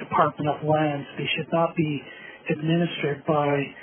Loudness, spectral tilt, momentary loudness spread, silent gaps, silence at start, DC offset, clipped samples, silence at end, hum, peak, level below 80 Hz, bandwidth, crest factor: -25 LUFS; -4 dB/octave; 7 LU; none; 0 s; under 0.1%; under 0.1%; 0 s; none; -6 dBFS; -66 dBFS; 3.5 kHz; 20 dB